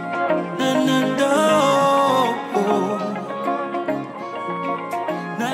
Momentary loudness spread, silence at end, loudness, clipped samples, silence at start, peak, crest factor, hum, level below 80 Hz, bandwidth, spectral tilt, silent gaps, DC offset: 10 LU; 0 s; -20 LUFS; under 0.1%; 0 s; -4 dBFS; 16 dB; none; -78 dBFS; 16 kHz; -5 dB/octave; none; under 0.1%